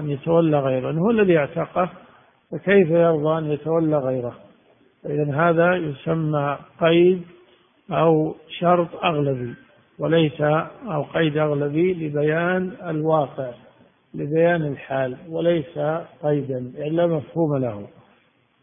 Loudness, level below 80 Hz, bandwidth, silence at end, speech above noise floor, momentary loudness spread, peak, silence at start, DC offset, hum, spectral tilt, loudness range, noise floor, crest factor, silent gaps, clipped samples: -21 LUFS; -60 dBFS; 3.7 kHz; 0.75 s; 40 dB; 11 LU; -4 dBFS; 0 s; under 0.1%; none; -12 dB/octave; 3 LU; -61 dBFS; 18 dB; none; under 0.1%